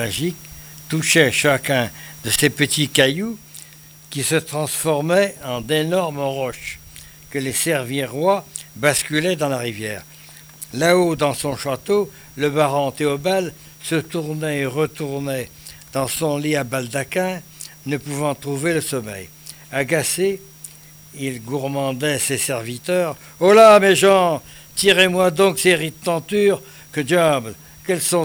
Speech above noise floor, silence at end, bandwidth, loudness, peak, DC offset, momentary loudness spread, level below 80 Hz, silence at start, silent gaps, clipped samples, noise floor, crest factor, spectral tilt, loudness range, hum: 24 dB; 0 s; over 20 kHz; -19 LUFS; 0 dBFS; under 0.1%; 17 LU; -54 dBFS; 0 s; none; under 0.1%; -43 dBFS; 20 dB; -4 dB/octave; 9 LU; none